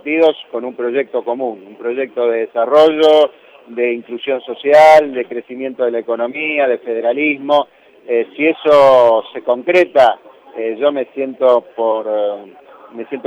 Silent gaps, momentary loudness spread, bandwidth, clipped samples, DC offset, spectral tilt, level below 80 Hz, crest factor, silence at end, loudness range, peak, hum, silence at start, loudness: none; 15 LU; 9.6 kHz; under 0.1%; under 0.1%; -5 dB/octave; -60 dBFS; 12 dB; 0.05 s; 4 LU; -2 dBFS; none; 0.05 s; -14 LUFS